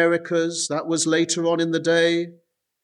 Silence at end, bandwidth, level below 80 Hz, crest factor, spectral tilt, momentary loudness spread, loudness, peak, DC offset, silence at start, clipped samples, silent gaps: 0.5 s; 11.5 kHz; -72 dBFS; 16 dB; -3.5 dB/octave; 6 LU; -21 LUFS; -6 dBFS; under 0.1%; 0 s; under 0.1%; none